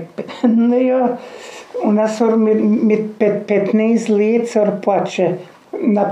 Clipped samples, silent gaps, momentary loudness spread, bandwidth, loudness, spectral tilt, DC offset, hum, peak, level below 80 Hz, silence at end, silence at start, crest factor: under 0.1%; none; 14 LU; 9.8 kHz; -16 LUFS; -7 dB/octave; under 0.1%; none; -2 dBFS; -76 dBFS; 0 s; 0 s; 14 dB